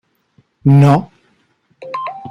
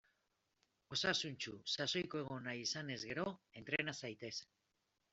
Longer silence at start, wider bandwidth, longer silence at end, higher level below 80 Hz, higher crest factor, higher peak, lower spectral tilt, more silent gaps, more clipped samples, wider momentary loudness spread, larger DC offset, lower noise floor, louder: second, 0.65 s vs 0.9 s; second, 6.2 kHz vs 8.2 kHz; second, 0 s vs 0.7 s; first, -52 dBFS vs -78 dBFS; second, 14 dB vs 24 dB; first, -2 dBFS vs -20 dBFS; first, -9 dB/octave vs -3 dB/octave; neither; neither; first, 16 LU vs 10 LU; neither; second, -59 dBFS vs -85 dBFS; first, -13 LUFS vs -42 LUFS